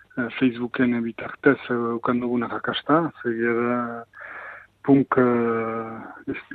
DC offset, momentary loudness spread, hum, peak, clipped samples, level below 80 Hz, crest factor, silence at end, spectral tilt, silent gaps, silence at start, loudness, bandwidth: under 0.1%; 15 LU; none; -4 dBFS; under 0.1%; -62 dBFS; 18 dB; 0 s; -9 dB/octave; none; 0.15 s; -23 LUFS; 4.6 kHz